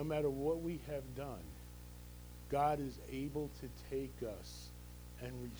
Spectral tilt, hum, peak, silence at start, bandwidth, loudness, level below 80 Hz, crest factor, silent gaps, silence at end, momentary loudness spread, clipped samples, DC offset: -6.5 dB/octave; 60 Hz at -55 dBFS; -24 dBFS; 0 s; over 20 kHz; -42 LUFS; -54 dBFS; 18 dB; none; 0 s; 17 LU; under 0.1%; under 0.1%